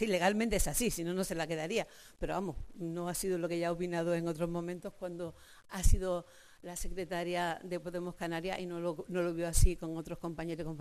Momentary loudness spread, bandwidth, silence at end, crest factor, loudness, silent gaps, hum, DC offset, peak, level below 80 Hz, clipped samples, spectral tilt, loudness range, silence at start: 11 LU; 14.5 kHz; 0 s; 20 dB; -36 LUFS; none; none; under 0.1%; -14 dBFS; -40 dBFS; under 0.1%; -4.5 dB/octave; 3 LU; 0 s